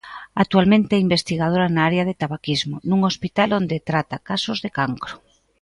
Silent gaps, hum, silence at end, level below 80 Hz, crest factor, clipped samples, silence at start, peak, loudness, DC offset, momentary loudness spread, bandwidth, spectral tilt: none; none; 0.45 s; -52 dBFS; 18 dB; under 0.1%; 0.05 s; -2 dBFS; -20 LUFS; under 0.1%; 9 LU; 11 kHz; -6 dB/octave